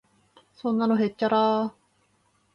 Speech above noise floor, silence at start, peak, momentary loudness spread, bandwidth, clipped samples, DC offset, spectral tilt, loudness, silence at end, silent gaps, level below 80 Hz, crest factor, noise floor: 44 dB; 0.65 s; -10 dBFS; 10 LU; 5.8 kHz; under 0.1%; under 0.1%; -7.5 dB/octave; -25 LUFS; 0.85 s; none; -72 dBFS; 16 dB; -67 dBFS